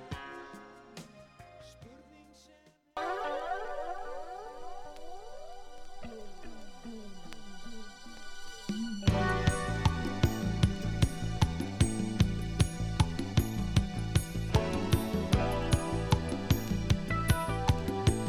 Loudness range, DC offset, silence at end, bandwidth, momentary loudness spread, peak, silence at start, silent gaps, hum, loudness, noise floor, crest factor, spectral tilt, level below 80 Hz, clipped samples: 17 LU; under 0.1%; 0 s; 15.5 kHz; 19 LU; -10 dBFS; 0 s; none; none; -32 LUFS; -62 dBFS; 22 dB; -6 dB/octave; -40 dBFS; under 0.1%